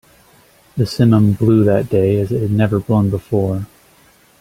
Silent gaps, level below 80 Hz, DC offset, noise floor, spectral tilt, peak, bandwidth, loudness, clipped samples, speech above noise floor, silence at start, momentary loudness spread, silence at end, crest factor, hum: none; -46 dBFS; under 0.1%; -50 dBFS; -8.5 dB/octave; -2 dBFS; 15 kHz; -15 LUFS; under 0.1%; 36 dB; 0.75 s; 9 LU; 0.75 s; 14 dB; none